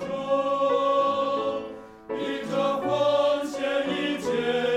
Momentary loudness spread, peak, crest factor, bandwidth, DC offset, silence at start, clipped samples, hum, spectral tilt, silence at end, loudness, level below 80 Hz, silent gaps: 9 LU; -12 dBFS; 14 dB; 12.5 kHz; under 0.1%; 0 s; under 0.1%; none; -5 dB/octave; 0 s; -25 LUFS; -64 dBFS; none